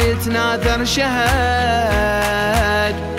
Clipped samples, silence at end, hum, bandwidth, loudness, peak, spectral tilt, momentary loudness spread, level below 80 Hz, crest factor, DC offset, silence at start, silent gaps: under 0.1%; 0 s; none; 16 kHz; -16 LUFS; -4 dBFS; -4.5 dB/octave; 2 LU; -26 dBFS; 14 dB; under 0.1%; 0 s; none